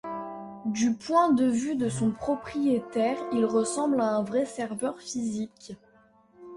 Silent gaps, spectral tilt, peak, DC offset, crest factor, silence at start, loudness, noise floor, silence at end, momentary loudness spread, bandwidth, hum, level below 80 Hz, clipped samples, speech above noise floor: none; -5.5 dB/octave; -10 dBFS; under 0.1%; 18 dB; 0.05 s; -27 LUFS; -60 dBFS; 0 s; 13 LU; 11.5 kHz; none; -64 dBFS; under 0.1%; 33 dB